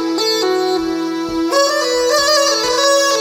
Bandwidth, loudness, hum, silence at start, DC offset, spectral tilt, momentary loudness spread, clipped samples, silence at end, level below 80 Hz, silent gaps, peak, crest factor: over 20 kHz; -14 LUFS; none; 0 s; under 0.1%; -1 dB/octave; 7 LU; under 0.1%; 0 s; -48 dBFS; none; 0 dBFS; 14 dB